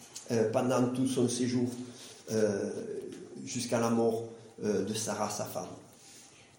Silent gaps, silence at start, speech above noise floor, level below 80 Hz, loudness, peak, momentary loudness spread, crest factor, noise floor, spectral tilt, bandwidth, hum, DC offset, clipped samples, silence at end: none; 0 s; 24 dB; -74 dBFS; -32 LUFS; -14 dBFS; 17 LU; 18 dB; -55 dBFS; -5 dB/octave; 17 kHz; none; under 0.1%; under 0.1%; 0.15 s